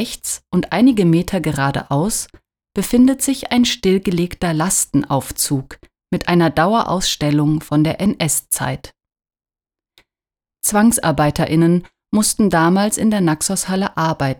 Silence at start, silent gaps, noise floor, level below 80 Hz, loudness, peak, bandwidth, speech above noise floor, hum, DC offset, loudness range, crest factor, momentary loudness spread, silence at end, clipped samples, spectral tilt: 0 s; none; under -90 dBFS; -42 dBFS; -17 LUFS; -2 dBFS; over 20 kHz; over 74 dB; none; under 0.1%; 4 LU; 14 dB; 7 LU; 0.05 s; under 0.1%; -4.5 dB/octave